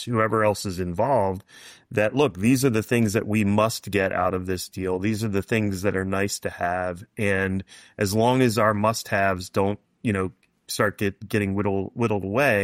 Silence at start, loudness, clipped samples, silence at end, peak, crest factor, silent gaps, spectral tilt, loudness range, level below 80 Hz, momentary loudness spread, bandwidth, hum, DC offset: 0 s; -24 LUFS; under 0.1%; 0 s; -8 dBFS; 16 dB; none; -5.5 dB/octave; 3 LU; -56 dBFS; 8 LU; 16 kHz; none; under 0.1%